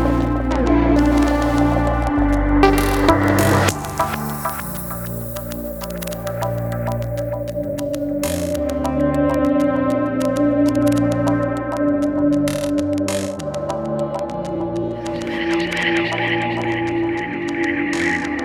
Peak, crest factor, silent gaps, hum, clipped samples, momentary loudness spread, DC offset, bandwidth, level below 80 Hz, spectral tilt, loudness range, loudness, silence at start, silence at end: 0 dBFS; 18 dB; none; none; under 0.1%; 10 LU; under 0.1%; over 20 kHz; -30 dBFS; -6 dB/octave; 8 LU; -19 LUFS; 0 s; 0 s